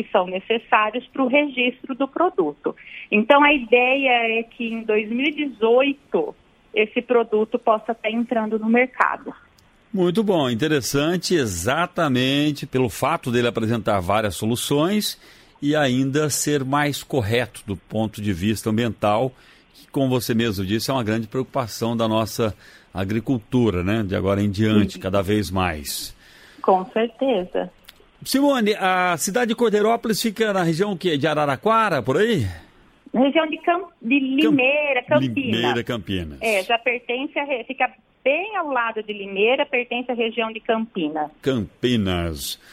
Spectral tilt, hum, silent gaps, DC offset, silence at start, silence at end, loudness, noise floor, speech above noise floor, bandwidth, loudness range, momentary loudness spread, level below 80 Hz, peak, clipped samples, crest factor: -5 dB/octave; none; none; under 0.1%; 0 s; 0.2 s; -21 LUFS; -52 dBFS; 31 dB; 16 kHz; 4 LU; 8 LU; -50 dBFS; -2 dBFS; under 0.1%; 20 dB